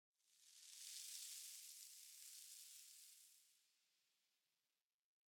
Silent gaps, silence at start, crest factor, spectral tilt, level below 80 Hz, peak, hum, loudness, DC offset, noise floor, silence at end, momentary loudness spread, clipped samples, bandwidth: none; 0.25 s; 26 dB; 6.5 dB/octave; under -90 dBFS; -36 dBFS; none; -57 LUFS; under 0.1%; under -90 dBFS; 1.55 s; 12 LU; under 0.1%; 19 kHz